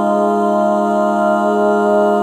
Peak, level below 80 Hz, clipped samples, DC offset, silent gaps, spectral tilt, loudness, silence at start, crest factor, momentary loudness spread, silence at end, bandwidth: -4 dBFS; -64 dBFS; under 0.1%; under 0.1%; none; -7 dB/octave; -14 LUFS; 0 s; 10 dB; 1 LU; 0 s; 14 kHz